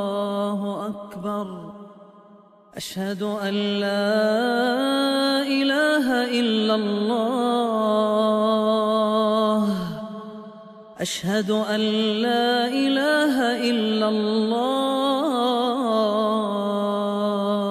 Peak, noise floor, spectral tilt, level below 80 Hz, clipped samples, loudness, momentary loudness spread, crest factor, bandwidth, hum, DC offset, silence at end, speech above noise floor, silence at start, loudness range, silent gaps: -8 dBFS; -50 dBFS; -5 dB/octave; -66 dBFS; under 0.1%; -22 LUFS; 10 LU; 14 dB; 14.5 kHz; none; under 0.1%; 0 s; 29 dB; 0 s; 5 LU; none